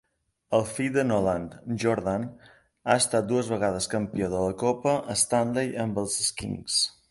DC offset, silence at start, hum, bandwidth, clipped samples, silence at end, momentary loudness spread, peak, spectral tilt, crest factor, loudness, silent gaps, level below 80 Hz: under 0.1%; 0.5 s; none; 12 kHz; under 0.1%; 0.2 s; 6 LU; -8 dBFS; -4 dB/octave; 20 dB; -26 LUFS; none; -54 dBFS